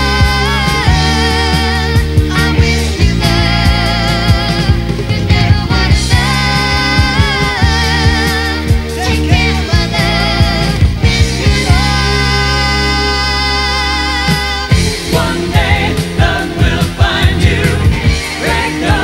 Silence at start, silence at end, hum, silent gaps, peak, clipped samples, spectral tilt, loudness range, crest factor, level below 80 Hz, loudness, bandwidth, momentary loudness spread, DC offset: 0 s; 0 s; none; none; 0 dBFS; 0.4%; -5 dB/octave; 1 LU; 10 dB; -18 dBFS; -11 LUFS; 16.5 kHz; 3 LU; under 0.1%